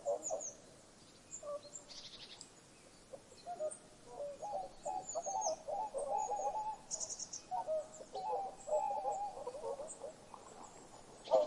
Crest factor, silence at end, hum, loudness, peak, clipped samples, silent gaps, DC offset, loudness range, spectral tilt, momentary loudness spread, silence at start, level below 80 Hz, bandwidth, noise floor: 22 dB; 0 s; none; -42 LUFS; -20 dBFS; under 0.1%; none; under 0.1%; 9 LU; -2 dB/octave; 18 LU; 0 s; -70 dBFS; 12 kHz; -61 dBFS